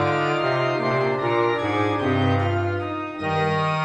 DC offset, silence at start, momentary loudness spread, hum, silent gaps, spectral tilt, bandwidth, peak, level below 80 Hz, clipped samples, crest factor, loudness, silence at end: under 0.1%; 0 s; 4 LU; none; none; -7 dB/octave; 9.6 kHz; -8 dBFS; -58 dBFS; under 0.1%; 14 dB; -22 LUFS; 0 s